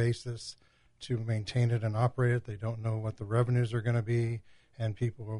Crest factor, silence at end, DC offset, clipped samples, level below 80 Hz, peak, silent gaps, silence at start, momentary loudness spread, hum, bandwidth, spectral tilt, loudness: 16 dB; 0 s; under 0.1%; under 0.1%; -60 dBFS; -14 dBFS; none; 0 s; 10 LU; none; 10.5 kHz; -7.5 dB/octave; -32 LUFS